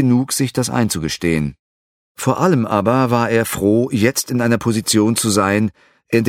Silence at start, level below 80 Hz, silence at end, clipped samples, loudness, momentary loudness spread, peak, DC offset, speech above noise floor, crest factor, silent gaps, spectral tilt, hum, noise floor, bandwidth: 0 s; -46 dBFS; 0 s; under 0.1%; -17 LUFS; 5 LU; 0 dBFS; under 0.1%; over 74 dB; 16 dB; 1.59-2.15 s; -5 dB/octave; none; under -90 dBFS; 17 kHz